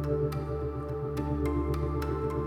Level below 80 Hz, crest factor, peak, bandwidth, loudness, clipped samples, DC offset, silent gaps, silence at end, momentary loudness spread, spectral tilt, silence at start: -38 dBFS; 12 dB; -18 dBFS; 15 kHz; -32 LUFS; under 0.1%; under 0.1%; none; 0 s; 4 LU; -8.5 dB/octave; 0 s